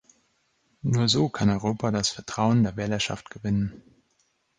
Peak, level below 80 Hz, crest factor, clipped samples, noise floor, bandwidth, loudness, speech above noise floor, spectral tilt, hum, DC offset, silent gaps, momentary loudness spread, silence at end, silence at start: -8 dBFS; -52 dBFS; 18 dB; under 0.1%; -70 dBFS; 10 kHz; -25 LUFS; 45 dB; -5 dB/octave; none; under 0.1%; none; 7 LU; 0.8 s; 0.85 s